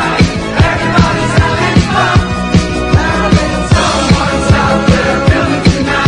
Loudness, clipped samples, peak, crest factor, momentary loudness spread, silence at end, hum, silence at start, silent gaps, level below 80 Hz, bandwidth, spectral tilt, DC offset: -10 LUFS; 0.4%; 0 dBFS; 10 dB; 2 LU; 0 s; none; 0 s; none; -22 dBFS; 11 kHz; -5.5 dB/octave; under 0.1%